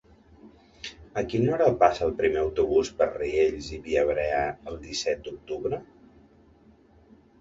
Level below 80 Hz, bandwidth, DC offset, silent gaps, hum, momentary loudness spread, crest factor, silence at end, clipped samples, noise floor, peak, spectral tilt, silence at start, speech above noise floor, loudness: -48 dBFS; 7.8 kHz; under 0.1%; none; none; 14 LU; 22 dB; 1.55 s; under 0.1%; -57 dBFS; -4 dBFS; -5.5 dB/octave; 0.45 s; 31 dB; -26 LUFS